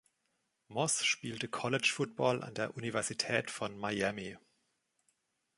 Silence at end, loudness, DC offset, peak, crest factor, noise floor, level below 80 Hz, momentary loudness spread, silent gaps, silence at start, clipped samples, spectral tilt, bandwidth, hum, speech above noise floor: 1.2 s; -34 LUFS; under 0.1%; -14 dBFS; 22 dB; -81 dBFS; -72 dBFS; 8 LU; none; 0.7 s; under 0.1%; -3 dB/octave; 11.5 kHz; none; 46 dB